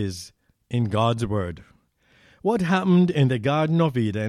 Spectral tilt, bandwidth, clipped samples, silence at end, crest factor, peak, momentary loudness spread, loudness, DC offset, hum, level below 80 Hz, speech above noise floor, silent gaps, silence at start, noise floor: -7.5 dB/octave; 12 kHz; under 0.1%; 0 s; 14 dB; -8 dBFS; 14 LU; -22 LUFS; under 0.1%; none; -52 dBFS; 39 dB; none; 0 s; -60 dBFS